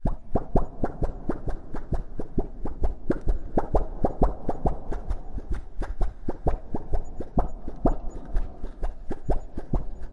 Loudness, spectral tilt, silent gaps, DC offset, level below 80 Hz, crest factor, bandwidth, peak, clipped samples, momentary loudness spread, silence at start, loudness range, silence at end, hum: -32 LUFS; -9.5 dB/octave; none; under 0.1%; -30 dBFS; 20 dB; 2.3 kHz; -6 dBFS; under 0.1%; 9 LU; 0 s; 3 LU; 0 s; none